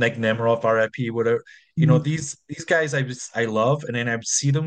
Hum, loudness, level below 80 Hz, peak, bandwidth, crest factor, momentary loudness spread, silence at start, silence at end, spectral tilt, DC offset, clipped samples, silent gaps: none; -22 LUFS; -62 dBFS; -6 dBFS; 10 kHz; 16 dB; 9 LU; 0 s; 0 s; -5 dB/octave; under 0.1%; under 0.1%; none